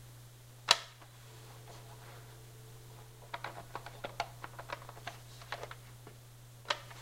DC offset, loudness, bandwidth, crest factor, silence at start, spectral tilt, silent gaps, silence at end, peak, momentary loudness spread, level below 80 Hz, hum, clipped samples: under 0.1%; -38 LUFS; 16 kHz; 38 dB; 0 s; -1.5 dB/octave; none; 0 s; -6 dBFS; 21 LU; -64 dBFS; none; under 0.1%